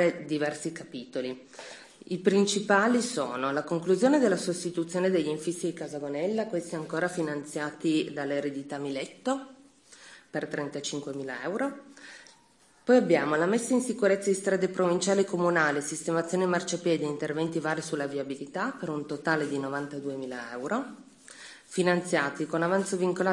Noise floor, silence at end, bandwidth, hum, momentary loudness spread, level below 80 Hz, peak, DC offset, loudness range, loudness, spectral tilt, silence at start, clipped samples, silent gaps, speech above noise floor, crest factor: -61 dBFS; 0 s; 12 kHz; none; 12 LU; -78 dBFS; -8 dBFS; under 0.1%; 7 LU; -29 LUFS; -5 dB/octave; 0 s; under 0.1%; none; 33 dB; 22 dB